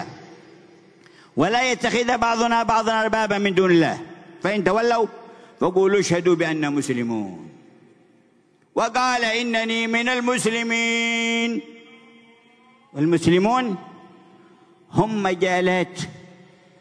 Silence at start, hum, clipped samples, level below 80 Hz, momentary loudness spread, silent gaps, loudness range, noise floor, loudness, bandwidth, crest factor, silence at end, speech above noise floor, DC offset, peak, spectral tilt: 0 s; none; under 0.1%; -56 dBFS; 11 LU; none; 4 LU; -59 dBFS; -21 LUFS; 11 kHz; 18 dB; 0.55 s; 39 dB; under 0.1%; -4 dBFS; -4.5 dB/octave